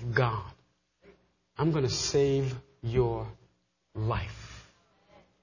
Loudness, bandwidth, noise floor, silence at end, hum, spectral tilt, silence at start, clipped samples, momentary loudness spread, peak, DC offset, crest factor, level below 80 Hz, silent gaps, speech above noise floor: -30 LUFS; 7.4 kHz; -71 dBFS; 0.8 s; none; -5.5 dB/octave; 0 s; under 0.1%; 21 LU; -10 dBFS; under 0.1%; 20 dB; -50 dBFS; none; 42 dB